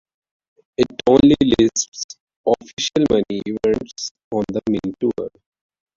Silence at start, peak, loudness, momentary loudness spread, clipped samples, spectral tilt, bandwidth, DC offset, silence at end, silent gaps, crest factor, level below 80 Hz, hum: 0.8 s; -2 dBFS; -19 LUFS; 16 LU; under 0.1%; -4.5 dB/octave; 7.6 kHz; under 0.1%; 0.7 s; 1.88-1.92 s, 2.04-2.09 s, 2.20-2.27 s, 2.36-2.44 s, 2.73-2.77 s, 4.11-4.15 s, 4.24-4.31 s; 18 dB; -46 dBFS; none